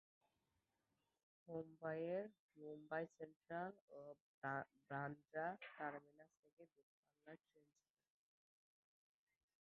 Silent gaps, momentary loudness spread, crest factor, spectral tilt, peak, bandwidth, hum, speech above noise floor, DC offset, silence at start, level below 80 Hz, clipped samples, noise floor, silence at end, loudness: 2.39-2.49 s, 3.36-3.40 s, 3.81-3.88 s, 4.20-4.42 s, 6.39-6.43 s, 6.53-6.57 s, 6.83-7.03 s; 13 LU; 22 dB; -5.5 dB/octave; -32 dBFS; 6 kHz; none; 38 dB; under 0.1%; 1.45 s; under -90 dBFS; under 0.1%; -90 dBFS; 2.05 s; -51 LUFS